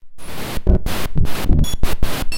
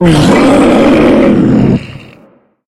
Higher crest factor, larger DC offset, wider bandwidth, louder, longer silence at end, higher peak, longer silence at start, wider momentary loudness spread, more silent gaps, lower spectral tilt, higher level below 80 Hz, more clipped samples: about the same, 12 dB vs 8 dB; neither; first, 16.5 kHz vs 13 kHz; second, -22 LUFS vs -7 LUFS; second, 0 s vs 0.65 s; about the same, 0 dBFS vs 0 dBFS; about the same, 0.05 s vs 0 s; first, 9 LU vs 6 LU; neither; second, -5.5 dB/octave vs -7 dB/octave; first, -20 dBFS vs -28 dBFS; second, under 0.1% vs 0.2%